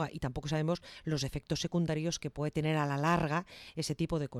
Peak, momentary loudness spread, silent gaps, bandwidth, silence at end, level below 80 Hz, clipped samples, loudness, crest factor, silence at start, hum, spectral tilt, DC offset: -18 dBFS; 8 LU; none; 13 kHz; 0 s; -54 dBFS; under 0.1%; -34 LUFS; 14 dB; 0 s; none; -5.5 dB/octave; under 0.1%